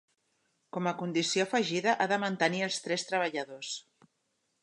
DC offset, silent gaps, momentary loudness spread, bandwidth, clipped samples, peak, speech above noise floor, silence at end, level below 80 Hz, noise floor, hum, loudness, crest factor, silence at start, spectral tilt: under 0.1%; none; 10 LU; 11.5 kHz; under 0.1%; -12 dBFS; 48 dB; 0.8 s; -84 dBFS; -78 dBFS; none; -31 LUFS; 20 dB; 0.75 s; -3.5 dB/octave